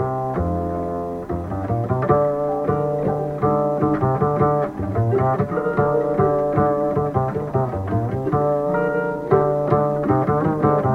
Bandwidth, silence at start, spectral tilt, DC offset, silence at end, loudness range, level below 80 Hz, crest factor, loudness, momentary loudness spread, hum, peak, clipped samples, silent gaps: 7.4 kHz; 0 s; -10.5 dB/octave; under 0.1%; 0 s; 2 LU; -42 dBFS; 16 dB; -20 LUFS; 5 LU; none; -4 dBFS; under 0.1%; none